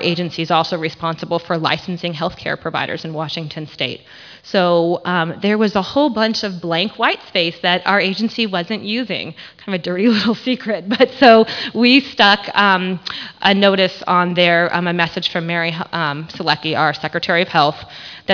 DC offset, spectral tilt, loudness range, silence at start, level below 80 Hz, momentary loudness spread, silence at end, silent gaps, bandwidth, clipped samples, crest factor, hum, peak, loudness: under 0.1%; -5.5 dB/octave; 7 LU; 0 s; -56 dBFS; 12 LU; 0 s; none; 5.4 kHz; under 0.1%; 16 dB; none; 0 dBFS; -16 LUFS